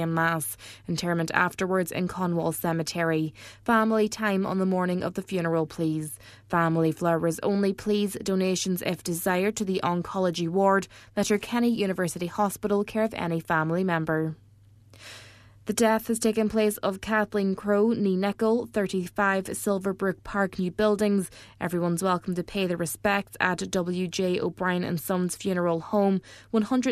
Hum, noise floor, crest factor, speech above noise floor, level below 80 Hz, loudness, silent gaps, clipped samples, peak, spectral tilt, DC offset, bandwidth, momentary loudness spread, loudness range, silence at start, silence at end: none; -54 dBFS; 22 dB; 28 dB; -58 dBFS; -26 LUFS; none; under 0.1%; -4 dBFS; -5.5 dB/octave; under 0.1%; 14 kHz; 6 LU; 2 LU; 0 s; 0 s